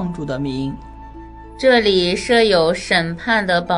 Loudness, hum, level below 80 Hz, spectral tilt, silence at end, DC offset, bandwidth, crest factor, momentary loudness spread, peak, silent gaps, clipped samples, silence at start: -16 LUFS; none; -40 dBFS; -4.5 dB/octave; 0 s; under 0.1%; 11 kHz; 16 dB; 14 LU; -2 dBFS; none; under 0.1%; 0 s